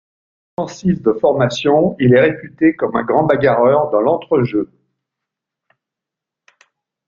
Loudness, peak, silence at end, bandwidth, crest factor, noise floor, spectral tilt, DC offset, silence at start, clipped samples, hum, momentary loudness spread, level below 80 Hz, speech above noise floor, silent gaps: -15 LUFS; 0 dBFS; 2.45 s; 7.6 kHz; 16 dB; -84 dBFS; -7 dB/octave; under 0.1%; 0.6 s; under 0.1%; none; 9 LU; -52 dBFS; 70 dB; none